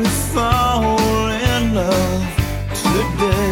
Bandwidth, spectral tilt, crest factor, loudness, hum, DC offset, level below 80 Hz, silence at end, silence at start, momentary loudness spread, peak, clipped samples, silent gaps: 17 kHz; -5 dB/octave; 14 dB; -17 LUFS; none; under 0.1%; -26 dBFS; 0 s; 0 s; 4 LU; -2 dBFS; under 0.1%; none